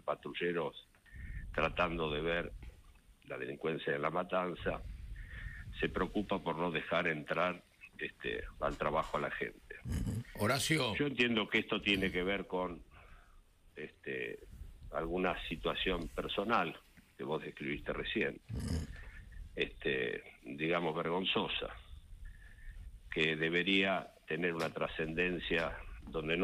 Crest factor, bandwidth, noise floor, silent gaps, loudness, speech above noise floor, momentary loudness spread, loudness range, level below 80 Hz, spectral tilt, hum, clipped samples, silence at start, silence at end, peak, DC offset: 20 dB; 15.5 kHz; -62 dBFS; none; -36 LUFS; 26 dB; 18 LU; 5 LU; -52 dBFS; -5 dB/octave; none; under 0.1%; 0.05 s; 0 s; -18 dBFS; under 0.1%